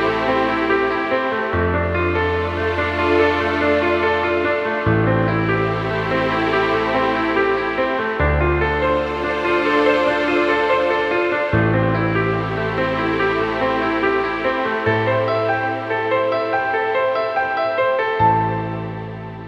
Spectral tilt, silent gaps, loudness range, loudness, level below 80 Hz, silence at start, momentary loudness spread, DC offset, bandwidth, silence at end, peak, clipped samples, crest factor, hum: -7.5 dB/octave; none; 2 LU; -18 LUFS; -36 dBFS; 0 s; 4 LU; under 0.1%; 9.2 kHz; 0 s; -4 dBFS; under 0.1%; 14 dB; none